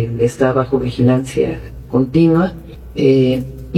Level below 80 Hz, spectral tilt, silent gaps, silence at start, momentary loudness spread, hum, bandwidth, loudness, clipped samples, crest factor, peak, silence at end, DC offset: -36 dBFS; -8 dB/octave; none; 0 s; 9 LU; none; 13.5 kHz; -15 LUFS; under 0.1%; 14 dB; -2 dBFS; 0 s; under 0.1%